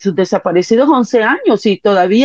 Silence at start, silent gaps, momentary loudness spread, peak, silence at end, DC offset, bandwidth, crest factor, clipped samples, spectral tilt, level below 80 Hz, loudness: 0 s; none; 3 LU; -2 dBFS; 0 s; under 0.1%; 7.8 kHz; 10 dB; under 0.1%; -5.5 dB/octave; -58 dBFS; -12 LUFS